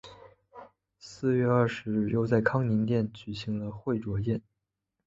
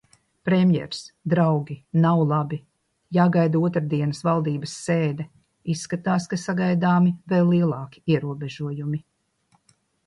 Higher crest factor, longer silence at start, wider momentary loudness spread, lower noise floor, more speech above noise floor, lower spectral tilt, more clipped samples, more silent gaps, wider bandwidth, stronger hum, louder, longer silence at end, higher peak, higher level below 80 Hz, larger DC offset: about the same, 20 dB vs 16 dB; second, 0.05 s vs 0.45 s; second, 9 LU vs 12 LU; first, -84 dBFS vs -66 dBFS; first, 56 dB vs 44 dB; about the same, -8 dB/octave vs -7.5 dB/octave; neither; neither; second, 7.8 kHz vs 11 kHz; neither; second, -29 LUFS vs -23 LUFS; second, 0.65 s vs 1.05 s; second, -10 dBFS vs -6 dBFS; first, -56 dBFS vs -62 dBFS; neither